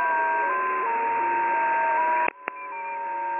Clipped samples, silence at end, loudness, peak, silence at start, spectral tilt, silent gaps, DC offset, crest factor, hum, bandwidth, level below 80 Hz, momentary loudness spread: under 0.1%; 0 s; -25 LUFS; -4 dBFS; 0 s; -1 dB/octave; none; under 0.1%; 20 dB; none; 3.6 kHz; -78 dBFS; 10 LU